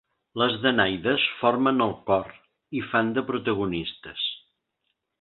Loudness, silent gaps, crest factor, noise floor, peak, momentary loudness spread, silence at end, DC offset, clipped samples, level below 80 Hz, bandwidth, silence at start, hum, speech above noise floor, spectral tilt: -25 LUFS; none; 22 dB; -78 dBFS; -4 dBFS; 12 LU; 0.85 s; under 0.1%; under 0.1%; -58 dBFS; 4.4 kHz; 0.35 s; none; 53 dB; -9.5 dB/octave